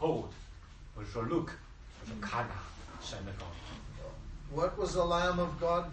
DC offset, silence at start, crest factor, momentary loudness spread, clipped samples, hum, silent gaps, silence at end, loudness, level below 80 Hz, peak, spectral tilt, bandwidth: under 0.1%; 0 s; 18 dB; 19 LU; under 0.1%; none; none; 0 s; -36 LUFS; -48 dBFS; -18 dBFS; -5.5 dB/octave; 8.4 kHz